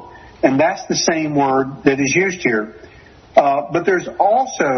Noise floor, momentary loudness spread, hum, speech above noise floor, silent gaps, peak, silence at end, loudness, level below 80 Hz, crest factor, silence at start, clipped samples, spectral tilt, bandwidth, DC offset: -43 dBFS; 4 LU; none; 27 dB; none; 0 dBFS; 0 s; -17 LUFS; -52 dBFS; 16 dB; 0 s; under 0.1%; -4 dB/octave; 6.4 kHz; under 0.1%